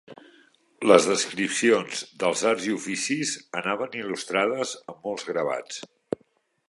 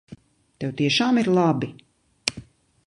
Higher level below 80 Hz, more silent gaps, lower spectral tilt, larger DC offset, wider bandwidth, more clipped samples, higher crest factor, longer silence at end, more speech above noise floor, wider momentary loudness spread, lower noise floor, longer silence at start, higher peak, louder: second, -72 dBFS vs -60 dBFS; neither; second, -3 dB/octave vs -5 dB/octave; neither; about the same, 11.5 kHz vs 11.5 kHz; neither; about the same, 24 dB vs 22 dB; first, 0.85 s vs 0.45 s; first, 42 dB vs 26 dB; first, 16 LU vs 13 LU; first, -66 dBFS vs -47 dBFS; about the same, 0.1 s vs 0.1 s; about the same, -2 dBFS vs -2 dBFS; about the same, -25 LUFS vs -23 LUFS